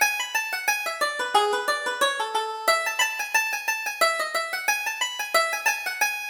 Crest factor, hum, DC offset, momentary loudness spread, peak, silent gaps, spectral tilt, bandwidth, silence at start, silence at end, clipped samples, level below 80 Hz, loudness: 18 dB; none; under 0.1%; 4 LU; -6 dBFS; none; 2 dB/octave; over 20 kHz; 0 s; 0 s; under 0.1%; -70 dBFS; -24 LUFS